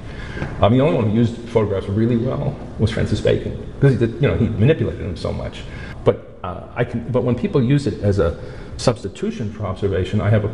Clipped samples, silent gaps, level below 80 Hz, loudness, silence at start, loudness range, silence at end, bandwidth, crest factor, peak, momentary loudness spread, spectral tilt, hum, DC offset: under 0.1%; none; -36 dBFS; -20 LUFS; 0 s; 3 LU; 0 s; 11 kHz; 18 dB; -2 dBFS; 12 LU; -7.5 dB/octave; none; 0.8%